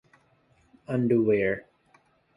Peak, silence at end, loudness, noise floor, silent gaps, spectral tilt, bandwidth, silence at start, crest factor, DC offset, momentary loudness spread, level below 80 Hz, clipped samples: -12 dBFS; 0.75 s; -26 LUFS; -64 dBFS; none; -9.5 dB/octave; 10.5 kHz; 0.9 s; 16 dB; under 0.1%; 10 LU; -62 dBFS; under 0.1%